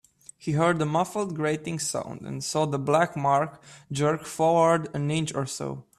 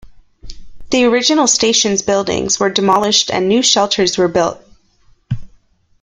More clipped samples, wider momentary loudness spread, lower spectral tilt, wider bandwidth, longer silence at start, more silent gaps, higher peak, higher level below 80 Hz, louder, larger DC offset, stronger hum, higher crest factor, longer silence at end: neither; first, 11 LU vs 8 LU; first, -5 dB/octave vs -2.5 dB/octave; about the same, 13.5 kHz vs 13 kHz; first, 0.4 s vs 0.05 s; neither; second, -8 dBFS vs 0 dBFS; second, -62 dBFS vs -42 dBFS; second, -26 LUFS vs -13 LUFS; neither; neither; about the same, 18 dB vs 16 dB; second, 0.2 s vs 0.55 s